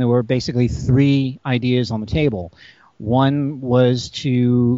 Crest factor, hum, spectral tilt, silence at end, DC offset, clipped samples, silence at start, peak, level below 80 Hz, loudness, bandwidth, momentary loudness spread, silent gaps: 14 dB; none; -7 dB/octave; 0 s; under 0.1%; under 0.1%; 0 s; -2 dBFS; -40 dBFS; -18 LUFS; 7.8 kHz; 6 LU; none